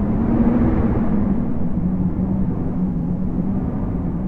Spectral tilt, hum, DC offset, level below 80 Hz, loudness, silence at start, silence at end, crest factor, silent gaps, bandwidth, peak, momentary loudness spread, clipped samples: -12 dB/octave; none; under 0.1%; -28 dBFS; -20 LUFS; 0 s; 0 s; 14 dB; none; 3.3 kHz; -6 dBFS; 6 LU; under 0.1%